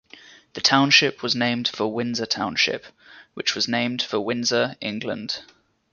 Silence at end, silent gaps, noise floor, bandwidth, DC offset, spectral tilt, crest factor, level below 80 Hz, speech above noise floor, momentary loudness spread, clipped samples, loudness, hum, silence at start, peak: 0.5 s; none; -49 dBFS; 7.2 kHz; under 0.1%; -3 dB/octave; 22 dB; -64 dBFS; 25 dB; 13 LU; under 0.1%; -22 LUFS; none; 0.55 s; -2 dBFS